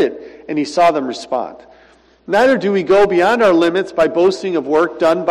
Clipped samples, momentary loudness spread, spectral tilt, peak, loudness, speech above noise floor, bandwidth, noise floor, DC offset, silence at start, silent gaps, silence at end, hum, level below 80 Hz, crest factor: under 0.1%; 10 LU; -5.5 dB/octave; -4 dBFS; -15 LUFS; 35 dB; 12.5 kHz; -49 dBFS; under 0.1%; 0 s; none; 0 s; none; -50 dBFS; 10 dB